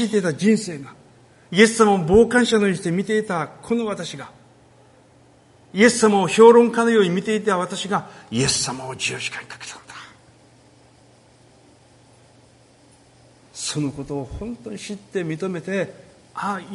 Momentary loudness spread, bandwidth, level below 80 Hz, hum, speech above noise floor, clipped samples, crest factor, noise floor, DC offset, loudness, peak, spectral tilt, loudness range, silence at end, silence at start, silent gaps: 18 LU; 11.5 kHz; -50 dBFS; none; 33 dB; under 0.1%; 20 dB; -53 dBFS; under 0.1%; -19 LUFS; 0 dBFS; -4.5 dB/octave; 15 LU; 0 s; 0 s; none